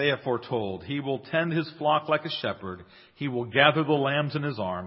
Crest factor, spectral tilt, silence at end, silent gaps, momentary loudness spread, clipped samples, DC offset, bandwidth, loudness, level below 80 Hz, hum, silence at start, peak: 24 dB; -10 dB/octave; 0 s; none; 12 LU; under 0.1%; under 0.1%; 5.8 kHz; -26 LUFS; -60 dBFS; none; 0 s; -4 dBFS